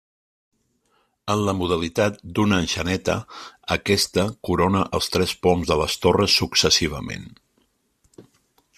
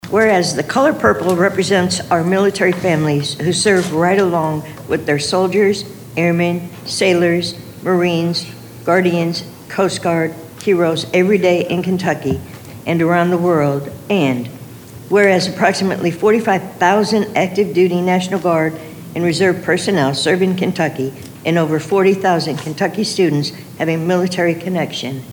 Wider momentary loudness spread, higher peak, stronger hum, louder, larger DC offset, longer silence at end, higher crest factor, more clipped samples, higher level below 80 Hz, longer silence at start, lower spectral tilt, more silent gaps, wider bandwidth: about the same, 11 LU vs 10 LU; about the same, -2 dBFS vs 0 dBFS; neither; second, -21 LUFS vs -16 LUFS; neither; first, 0.55 s vs 0 s; about the same, 20 dB vs 16 dB; neither; first, -46 dBFS vs -52 dBFS; first, 1.25 s vs 0.05 s; second, -4 dB/octave vs -5.5 dB/octave; neither; second, 15 kHz vs over 20 kHz